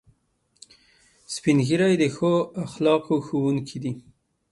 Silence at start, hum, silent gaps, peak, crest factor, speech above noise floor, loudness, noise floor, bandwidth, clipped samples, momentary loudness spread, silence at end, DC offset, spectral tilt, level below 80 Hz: 1.3 s; none; none; -6 dBFS; 18 dB; 46 dB; -23 LUFS; -68 dBFS; 11.5 kHz; under 0.1%; 12 LU; 0.5 s; under 0.1%; -6 dB/octave; -62 dBFS